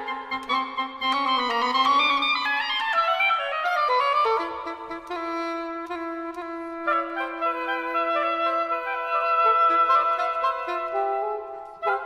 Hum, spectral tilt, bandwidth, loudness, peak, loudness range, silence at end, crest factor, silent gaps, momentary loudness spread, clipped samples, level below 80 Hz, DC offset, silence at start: none; -2 dB/octave; 15 kHz; -24 LUFS; -10 dBFS; 6 LU; 0 s; 16 dB; none; 13 LU; under 0.1%; -64 dBFS; under 0.1%; 0 s